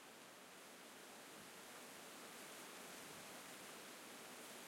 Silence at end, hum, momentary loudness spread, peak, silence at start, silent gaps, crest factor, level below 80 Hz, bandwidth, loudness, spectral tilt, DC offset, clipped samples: 0 s; none; 4 LU; -42 dBFS; 0 s; none; 16 dB; under -90 dBFS; 16.5 kHz; -55 LUFS; -1.5 dB/octave; under 0.1%; under 0.1%